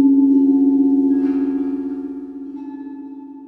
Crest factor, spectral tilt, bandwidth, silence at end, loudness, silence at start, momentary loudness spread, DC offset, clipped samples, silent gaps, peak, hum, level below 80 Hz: 12 dB; -9.5 dB/octave; 2.4 kHz; 0 s; -16 LUFS; 0 s; 19 LU; under 0.1%; under 0.1%; none; -6 dBFS; 60 Hz at -55 dBFS; -56 dBFS